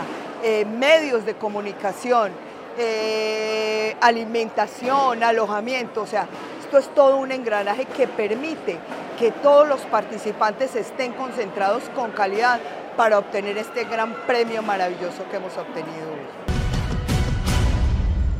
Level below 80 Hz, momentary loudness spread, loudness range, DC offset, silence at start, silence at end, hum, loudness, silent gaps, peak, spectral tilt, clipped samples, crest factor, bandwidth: -32 dBFS; 12 LU; 4 LU; under 0.1%; 0 s; 0 s; none; -22 LUFS; none; -2 dBFS; -5.5 dB/octave; under 0.1%; 20 dB; 16 kHz